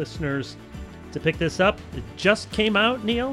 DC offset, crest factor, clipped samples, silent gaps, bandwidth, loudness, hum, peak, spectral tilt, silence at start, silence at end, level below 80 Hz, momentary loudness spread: under 0.1%; 20 dB; under 0.1%; none; 13.5 kHz; -23 LUFS; none; -4 dBFS; -5 dB/octave; 0 s; 0 s; -42 dBFS; 17 LU